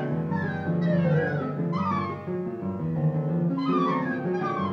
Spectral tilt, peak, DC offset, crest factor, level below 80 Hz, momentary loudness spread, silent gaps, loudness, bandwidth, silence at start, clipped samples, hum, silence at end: -9.5 dB/octave; -14 dBFS; under 0.1%; 14 dB; -60 dBFS; 7 LU; none; -27 LUFS; 6 kHz; 0 s; under 0.1%; none; 0 s